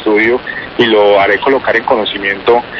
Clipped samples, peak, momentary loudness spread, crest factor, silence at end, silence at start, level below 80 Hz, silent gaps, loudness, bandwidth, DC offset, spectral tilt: under 0.1%; 0 dBFS; 6 LU; 10 dB; 0 s; 0 s; -44 dBFS; none; -11 LUFS; 6.6 kHz; under 0.1%; -6 dB/octave